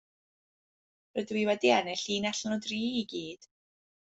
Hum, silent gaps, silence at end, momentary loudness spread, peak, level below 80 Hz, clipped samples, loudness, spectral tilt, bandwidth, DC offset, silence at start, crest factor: none; none; 0.65 s; 13 LU; -10 dBFS; -74 dBFS; under 0.1%; -31 LUFS; -3.5 dB/octave; 8.2 kHz; under 0.1%; 1.15 s; 22 dB